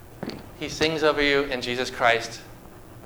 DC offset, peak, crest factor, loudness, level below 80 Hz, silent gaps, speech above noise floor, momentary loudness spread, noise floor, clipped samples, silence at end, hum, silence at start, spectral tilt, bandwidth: under 0.1%; -6 dBFS; 20 dB; -23 LUFS; -48 dBFS; none; 21 dB; 15 LU; -44 dBFS; under 0.1%; 0 s; none; 0 s; -3.5 dB/octave; over 20 kHz